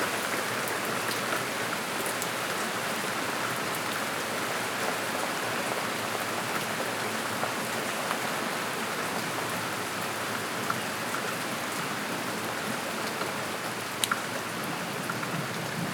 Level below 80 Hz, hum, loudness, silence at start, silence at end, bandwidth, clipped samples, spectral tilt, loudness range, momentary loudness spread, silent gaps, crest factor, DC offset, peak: -72 dBFS; none; -30 LUFS; 0 s; 0 s; over 20 kHz; under 0.1%; -2.5 dB/octave; 1 LU; 2 LU; none; 28 dB; under 0.1%; -4 dBFS